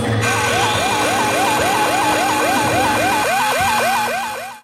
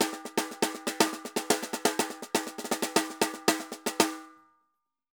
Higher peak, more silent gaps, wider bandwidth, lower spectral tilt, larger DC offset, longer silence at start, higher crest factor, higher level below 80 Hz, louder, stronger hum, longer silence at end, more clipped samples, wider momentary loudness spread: about the same, -4 dBFS vs -6 dBFS; neither; second, 16 kHz vs over 20 kHz; about the same, -3 dB/octave vs -2 dB/octave; neither; about the same, 0 s vs 0 s; second, 12 dB vs 26 dB; first, -46 dBFS vs -82 dBFS; first, -16 LUFS vs -29 LUFS; neither; second, 0.05 s vs 0.8 s; neither; second, 2 LU vs 5 LU